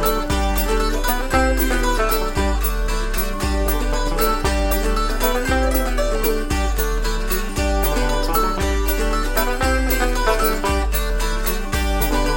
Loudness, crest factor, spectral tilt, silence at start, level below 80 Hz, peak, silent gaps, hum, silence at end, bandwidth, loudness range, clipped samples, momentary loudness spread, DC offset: -20 LUFS; 14 dB; -4.5 dB/octave; 0 s; -20 dBFS; -4 dBFS; none; none; 0 s; 17 kHz; 1 LU; under 0.1%; 4 LU; 0.7%